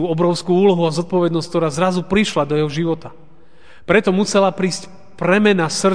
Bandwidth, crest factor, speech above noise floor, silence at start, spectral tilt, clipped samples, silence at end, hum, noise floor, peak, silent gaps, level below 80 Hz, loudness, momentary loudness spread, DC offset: 10 kHz; 18 dB; 32 dB; 0 s; -5.5 dB/octave; under 0.1%; 0 s; none; -49 dBFS; 0 dBFS; none; -48 dBFS; -17 LUFS; 8 LU; 1%